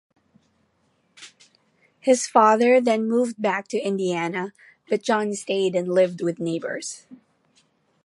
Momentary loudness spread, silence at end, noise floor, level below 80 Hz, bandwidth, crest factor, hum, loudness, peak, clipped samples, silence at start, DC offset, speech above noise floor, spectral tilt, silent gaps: 13 LU; 0.9 s; -67 dBFS; -76 dBFS; 11.5 kHz; 20 dB; none; -22 LUFS; -2 dBFS; under 0.1%; 1.2 s; under 0.1%; 45 dB; -4.5 dB/octave; none